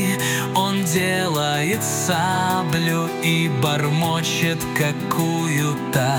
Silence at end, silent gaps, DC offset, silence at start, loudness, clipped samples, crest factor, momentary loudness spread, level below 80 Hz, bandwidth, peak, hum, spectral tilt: 0 s; none; under 0.1%; 0 s; -20 LUFS; under 0.1%; 16 dB; 2 LU; -54 dBFS; 19.5 kHz; -4 dBFS; none; -4.5 dB/octave